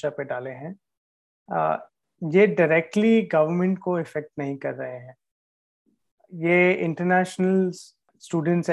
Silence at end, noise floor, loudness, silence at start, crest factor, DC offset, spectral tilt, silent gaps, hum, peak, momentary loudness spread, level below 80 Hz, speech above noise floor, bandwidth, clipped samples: 0 s; under -90 dBFS; -23 LUFS; 0.05 s; 18 dB; under 0.1%; -7 dB/octave; 0.97-1.46 s, 5.31-5.85 s, 6.11-6.18 s; none; -6 dBFS; 16 LU; -72 dBFS; over 67 dB; 11.5 kHz; under 0.1%